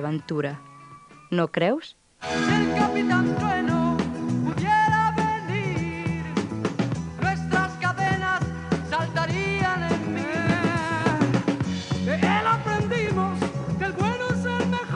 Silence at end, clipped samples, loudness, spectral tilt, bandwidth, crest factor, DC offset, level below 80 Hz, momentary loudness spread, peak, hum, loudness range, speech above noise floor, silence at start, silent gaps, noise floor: 0 s; under 0.1%; -24 LUFS; -6 dB/octave; 11 kHz; 16 dB; under 0.1%; -48 dBFS; 7 LU; -8 dBFS; none; 3 LU; 24 dB; 0 s; none; -47 dBFS